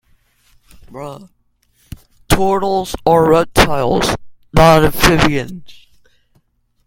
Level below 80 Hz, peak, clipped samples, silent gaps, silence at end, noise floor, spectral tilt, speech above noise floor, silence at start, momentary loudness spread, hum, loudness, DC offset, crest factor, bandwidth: -30 dBFS; 0 dBFS; under 0.1%; none; 1.1 s; -59 dBFS; -5 dB/octave; 46 dB; 0.9 s; 21 LU; none; -13 LUFS; under 0.1%; 16 dB; 17 kHz